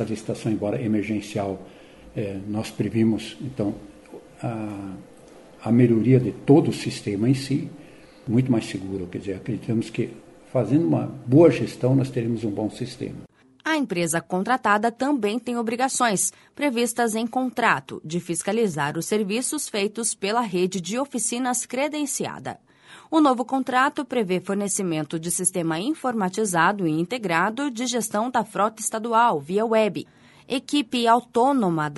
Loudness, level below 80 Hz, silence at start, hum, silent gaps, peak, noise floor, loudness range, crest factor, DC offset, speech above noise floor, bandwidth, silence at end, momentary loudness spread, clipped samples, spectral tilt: -23 LUFS; -60 dBFS; 0 s; none; none; -4 dBFS; -47 dBFS; 5 LU; 20 dB; under 0.1%; 24 dB; 12 kHz; 0 s; 11 LU; under 0.1%; -5 dB/octave